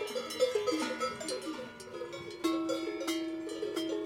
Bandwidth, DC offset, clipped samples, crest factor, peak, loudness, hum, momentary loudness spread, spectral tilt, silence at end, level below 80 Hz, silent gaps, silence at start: 16.5 kHz; under 0.1%; under 0.1%; 18 dB; -18 dBFS; -35 LUFS; none; 11 LU; -3 dB/octave; 0 s; -74 dBFS; none; 0 s